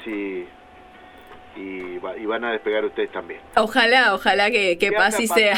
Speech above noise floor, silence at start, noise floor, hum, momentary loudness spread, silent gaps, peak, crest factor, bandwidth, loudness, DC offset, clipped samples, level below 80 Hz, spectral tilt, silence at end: 25 dB; 0 s; -46 dBFS; none; 17 LU; none; -2 dBFS; 20 dB; 17 kHz; -19 LUFS; under 0.1%; under 0.1%; -56 dBFS; -2.5 dB/octave; 0 s